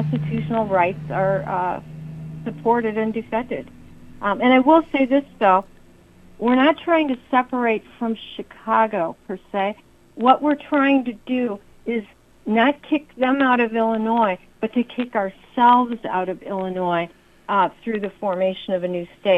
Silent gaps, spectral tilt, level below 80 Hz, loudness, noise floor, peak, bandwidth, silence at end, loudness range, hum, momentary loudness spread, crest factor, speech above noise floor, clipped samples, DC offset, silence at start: none; -8 dB/octave; -54 dBFS; -21 LUFS; -49 dBFS; -2 dBFS; 5.6 kHz; 0 s; 4 LU; none; 12 LU; 20 dB; 29 dB; under 0.1%; under 0.1%; 0 s